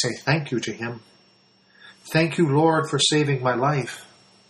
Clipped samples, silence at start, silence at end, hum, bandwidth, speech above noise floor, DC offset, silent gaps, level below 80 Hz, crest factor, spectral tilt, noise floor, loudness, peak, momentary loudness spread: under 0.1%; 0 s; 0.45 s; none; 12 kHz; 36 dB; under 0.1%; none; -62 dBFS; 16 dB; -4.5 dB/octave; -58 dBFS; -22 LUFS; -6 dBFS; 14 LU